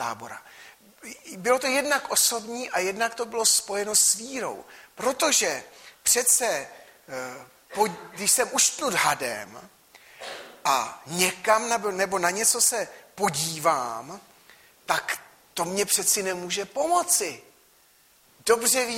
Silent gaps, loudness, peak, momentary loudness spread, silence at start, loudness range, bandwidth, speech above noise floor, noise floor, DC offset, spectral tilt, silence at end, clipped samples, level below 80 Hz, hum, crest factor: none; -23 LUFS; -6 dBFS; 18 LU; 0 s; 4 LU; 16.5 kHz; 34 dB; -59 dBFS; under 0.1%; -1 dB/octave; 0 s; under 0.1%; -68 dBFS; none; 22 dB